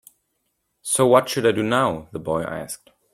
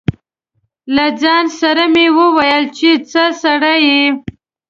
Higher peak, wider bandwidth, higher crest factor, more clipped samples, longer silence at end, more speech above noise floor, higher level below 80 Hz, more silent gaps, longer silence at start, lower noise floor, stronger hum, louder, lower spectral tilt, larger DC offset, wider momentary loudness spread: about the same, -2 dBFS vs 0 dBFS; first, 16 kHz vs 7.6 kHz; first, 20 dB vs 12 dB; neither; about the same, 0.4 s vs 0.5 s; about the same, 53 dB vs 54 dB; second, -56 dBFS vs -44 dBFS; neither; first, 0.85 s vs 0.1 s; first, -73 dBFS vs -66 dBFS; neither; second, -20 LUFS vs -11 LUFS; about the same, -4 dB/octave vs -4.5 dB/octave; neither; first, 18 LU vs 6 LU